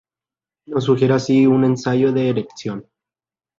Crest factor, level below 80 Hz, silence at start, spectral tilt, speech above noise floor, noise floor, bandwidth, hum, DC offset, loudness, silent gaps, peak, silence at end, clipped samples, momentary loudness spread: 14 dB; -58 dBFS; 0.7 s; -7.5 dB/octave; over 73 dB; under -90 dBFS; 7.6 kHz; none; under 0.1%; -17 LUFS; none; -4 dBFS; 0.75 s; under 0.1%; 14 LU